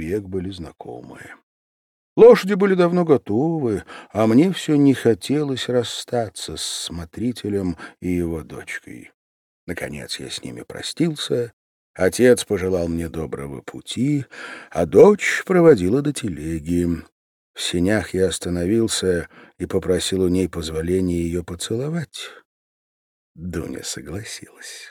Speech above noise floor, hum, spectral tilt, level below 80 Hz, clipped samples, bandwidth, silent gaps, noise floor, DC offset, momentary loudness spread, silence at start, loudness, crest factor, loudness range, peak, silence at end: over 70 dB; none; -5.5 dB/octave; -50 dBFS; under 0.1%; 17 kHz; 1.43-2.16 s, 9.14-9.67 s, 11.53-11.94 s, 17.12-17.54 s, 22.45-23.35 s; under -90 dBFS; under 0.1%; 18 LU; 0 s; -20 LUFS; 20 dB; 10 LU; -2 dBFS; 0 s